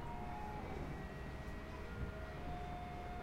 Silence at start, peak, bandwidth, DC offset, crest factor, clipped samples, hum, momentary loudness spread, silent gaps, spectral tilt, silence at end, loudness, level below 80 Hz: 0 s; -32 dBFS; 16 kHz; under 0.1%; 14 dB; under 0.1%; none; 2 LU; none; -7 dB/octave; 0 s; -48 LUFS; -50 dBFS